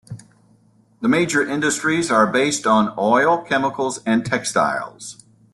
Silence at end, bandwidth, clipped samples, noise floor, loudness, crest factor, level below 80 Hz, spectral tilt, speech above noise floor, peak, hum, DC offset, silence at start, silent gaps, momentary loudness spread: 0.4 s; 12.5 kHz; under 0.1%; -56 dBFS; -19 LUFS; 16 dB; -60 dBFS; -4 dB/octave; 37 dB; -4 dBFS; none; under 0.1%; 0.1 s; none; 13 LU